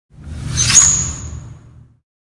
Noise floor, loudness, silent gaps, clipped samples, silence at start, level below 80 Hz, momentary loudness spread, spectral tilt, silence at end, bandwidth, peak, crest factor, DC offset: -43 dBFS; -11 LUFS; none; under 0.1%; 0.2 s; -34 dBFS; 25 LU; -1 dB/octave; 0.7 s; 12 kHz; 0 dBFS; 18 dB; under 0.1%